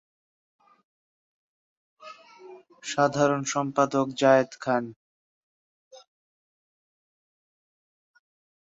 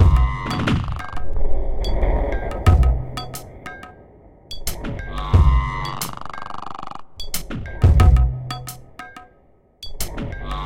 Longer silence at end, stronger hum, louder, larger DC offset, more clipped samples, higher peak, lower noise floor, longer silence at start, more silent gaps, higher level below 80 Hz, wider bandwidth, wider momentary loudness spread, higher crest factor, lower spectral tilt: first, 2.75 s vs 0 s; neither; about the same, -24 LUFS vs -22 LUFS; neither; neither; second, -6 dBFS vs -2 dBFS; second, -49 dBFS vs -54 dBFS; first, 2.05 s vs 0 s; first, 4.96-5.91 s vs none; second, -74 dBFS vs -22 dBFS; second, 8 kHz vs 16.5 kHz; about the same, 22 LU vs 20 LU; first, 24 dB vs 18 dB; about the same, -5 dB/octave vs -6 dB/octave